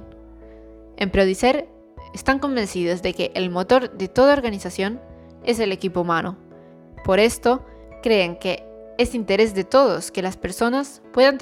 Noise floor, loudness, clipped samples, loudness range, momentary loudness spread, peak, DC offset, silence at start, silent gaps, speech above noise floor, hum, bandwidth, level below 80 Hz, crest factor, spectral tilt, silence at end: -45 dBFS; -21 LUFS; under 0.1%; 2 LU; 10 LU; -4 dBFS; under 0.1%; 0 s; none; 25 dB; none; 15.5 kHz; -44 dBFS; 18 dB; -5 dB/octave; 0 s